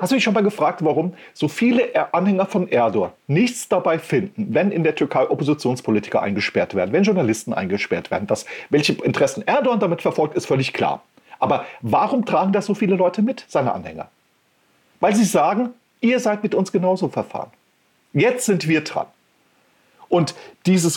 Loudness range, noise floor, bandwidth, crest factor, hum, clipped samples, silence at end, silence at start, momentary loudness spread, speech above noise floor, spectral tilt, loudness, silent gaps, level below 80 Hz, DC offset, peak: 2 LU; -62 dBFS; 17.5 kHz; 14 dB; none; under 0.1%; 0 s; 0 s; 7 LU; 43 dB; -5.5 dB/octave; -20 LUFS; none; -62 dBFS; under 0.1%; -6 dBFS